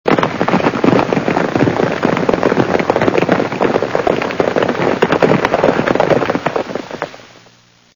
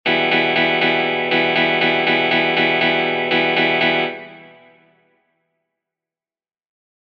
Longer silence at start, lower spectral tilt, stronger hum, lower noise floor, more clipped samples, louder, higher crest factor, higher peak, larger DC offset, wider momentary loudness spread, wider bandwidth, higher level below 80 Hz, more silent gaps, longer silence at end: about the same, 0.05 s vs 0.05 s; about the same, -6.5 dB/octave vs -6 dB/octave; neither; second, -48 dBFS vs under -90 dBFS; neither; about the same, -14 LUFS vs -16 LUFS; about the same, 14 dB vs 16 dB; first, 0 dBFS vs -4 dBFS; neither; about the same, 5 LU vs 3 LU; first, over 20 kHz vs 7 kHz; first, -44 dBFS vs -62 dBFS; neither; second, 0.7 s vs 2.6 s